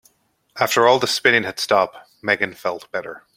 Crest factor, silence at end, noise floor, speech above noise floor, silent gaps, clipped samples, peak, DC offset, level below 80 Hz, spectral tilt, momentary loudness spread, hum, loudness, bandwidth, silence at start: 18 dB; 0.2 s; -62 dBFS; 43 dB; none; under 0.1%; -2 dBFS; under 0.1%; -66 dBFS; -2.5 dB/octave; 14 LU; none; -19 LUFS; 16.5 kHz; 0.55 s